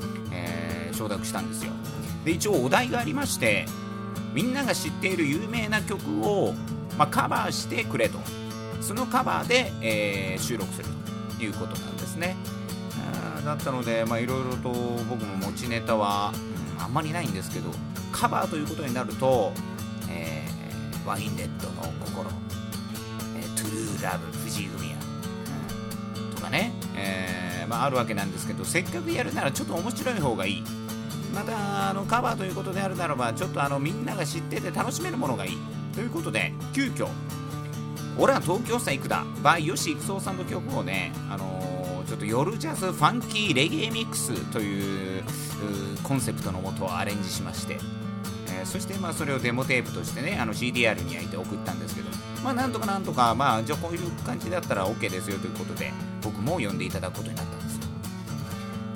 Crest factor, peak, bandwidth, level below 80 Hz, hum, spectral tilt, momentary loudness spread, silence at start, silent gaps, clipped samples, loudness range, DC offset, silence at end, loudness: 24 dB; -6 dBFS; 19 kHz; -54 dBFS; none; -4.5 dB/octave; 10 LU; 0 s; none; under 0.1%; 5 LU; under 0.1%; 0 s; -28 LUFS